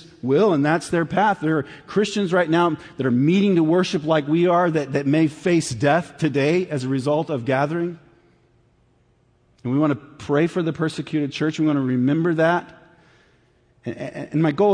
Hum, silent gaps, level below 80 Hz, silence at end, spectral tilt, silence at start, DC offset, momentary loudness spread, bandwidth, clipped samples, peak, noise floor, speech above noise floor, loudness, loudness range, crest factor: none; none; -60 dBFS; 0 s; -6.5 dB/octave; 0 s; under 0.1%; 8 LU; 10.5 kHz; under 0.1%; -6 dBFS; -60 dBFS; 40 dB; -21 LUFS; 6 LU; 14 dB